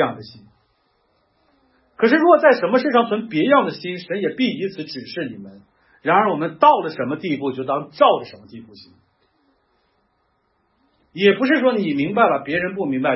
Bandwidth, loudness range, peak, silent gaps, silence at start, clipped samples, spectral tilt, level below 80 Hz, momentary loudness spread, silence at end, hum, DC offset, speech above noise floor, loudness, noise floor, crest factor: 5.8 kHz; 7 LU; 0 dBFS; none; 0 s; under 0.1%; -9.5 dB/octave; -66 dBFS; 14 LU; 0 s; none; under 0.1%; 48 dB; -18 LUFS; -66 dBFS; 20 dB